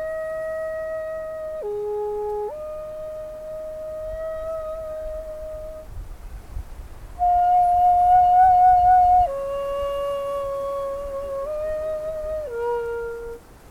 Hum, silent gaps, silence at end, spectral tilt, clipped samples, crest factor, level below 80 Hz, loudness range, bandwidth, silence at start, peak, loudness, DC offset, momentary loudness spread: none; none; 0 s; -5.5 dB/octave; under 0.1%; 14 dB; -40 dBFS; 15 LU; 13.5 kHz; 0 s; -8 dBFS; -22 LUFS; under 0.1%; 23 LU